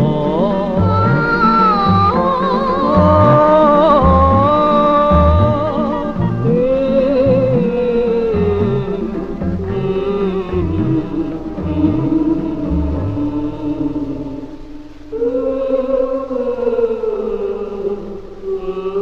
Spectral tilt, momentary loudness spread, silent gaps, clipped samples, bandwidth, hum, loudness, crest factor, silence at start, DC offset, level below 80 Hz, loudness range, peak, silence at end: -9.5 dB/octave; 12 LU; none; under 0.1%; 7 kHz; none; -15 LUFS; 14 dB; 0 s; under 0.1%; -28 dBFS; 9 LU; 0 dBFS; 0 s